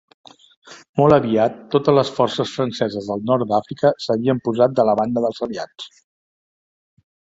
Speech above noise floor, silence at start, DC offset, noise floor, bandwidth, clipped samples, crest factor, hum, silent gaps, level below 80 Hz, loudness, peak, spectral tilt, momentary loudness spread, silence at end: over 72 dB; 0.65 s; under 0.1%; under -90 dBFS; 7.8 kHz; under 0.1%; 18 dB; none; 0.89-0.94 s; -56 dBFS; -19 LUFS; -2 dBFS; -7 dB/octave; 12 LU; 1.5 s